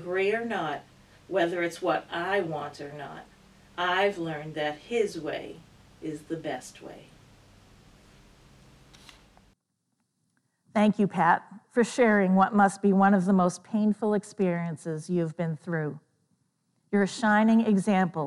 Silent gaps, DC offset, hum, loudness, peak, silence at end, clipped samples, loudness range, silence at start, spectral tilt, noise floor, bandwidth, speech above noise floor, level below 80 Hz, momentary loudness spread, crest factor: none; under 0.1%; none; -26 LUFS; -8 dBFS; 0 s; under 0.1%; 16 LU; 0 s; -6.5 dB/octave; -78 dBFS; 11.5 kHz; 52 dB; -66 dBFS; 17 LU; 20 dB